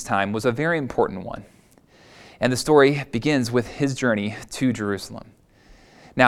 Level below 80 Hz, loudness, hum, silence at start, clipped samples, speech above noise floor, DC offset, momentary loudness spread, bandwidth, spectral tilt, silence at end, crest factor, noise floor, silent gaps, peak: -52 dBFS; -22 LUFS; none; 0 s; under 0.1%; 32 dB; under 0.1%; 17 LU; 15.5 kHz; -5.5 dB/octave; 0 s; 22 dB; -54 dBFS; none; 0 dBFS